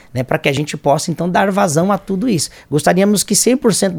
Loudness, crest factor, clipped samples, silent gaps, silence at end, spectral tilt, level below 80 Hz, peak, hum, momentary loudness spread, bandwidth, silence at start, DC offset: -15 LUFS; 14 dB; under 0.1%; none; 0 s; -4.5 dB/octave; -48 dBFS; 0 dBFS; none; 5 LU; 18.5 kHz; 0.15 s; under 0.1%